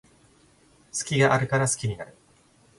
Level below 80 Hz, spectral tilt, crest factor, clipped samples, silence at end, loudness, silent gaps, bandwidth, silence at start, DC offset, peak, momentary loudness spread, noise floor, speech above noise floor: -58 dBFS; -4.5 dB/octave; 20 dB; under 0.1%; 0.7 s; -24 LUFS; none; 11.5 kHz; 0.95 s; under 0.1%; -8 dBFS; 15 LU; -60 dBFS; 36 dB